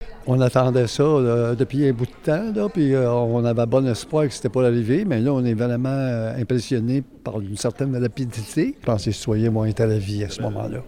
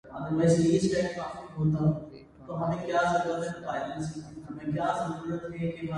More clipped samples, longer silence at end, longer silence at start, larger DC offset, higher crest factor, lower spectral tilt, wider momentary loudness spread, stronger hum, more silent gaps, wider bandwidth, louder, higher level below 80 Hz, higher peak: neither; about the same, 0 s vs 0 s; about the same, 0 s vs 0.05 s; neither; about the same, 16 dB vs 18 dB; about the same, -7 dB/octave vs -6.5 dB/octave; second, 7 LU vs 14 LU; neither; neither; first, 14 kHz vs 11 kHz; first, -21 LUFS vs -29 LUFS; first, -46 dBFS vs -56 dBFS; first, -4 dBFS vs -12 dBFS